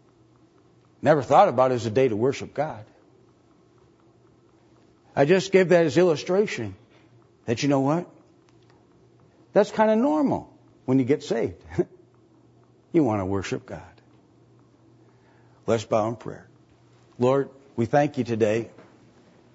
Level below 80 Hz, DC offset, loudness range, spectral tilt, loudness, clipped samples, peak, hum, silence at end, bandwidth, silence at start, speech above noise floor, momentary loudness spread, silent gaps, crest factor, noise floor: -64 dBFS; under 0.1%; 7 LU; -6.5 dB/octave; -23 LUFS; under 0.1%; -4 dBFS; none; 0.85 s; 8 kHz; 1.05 s; 36 dB; 16 LU; none; 22 dB; -58 dBFS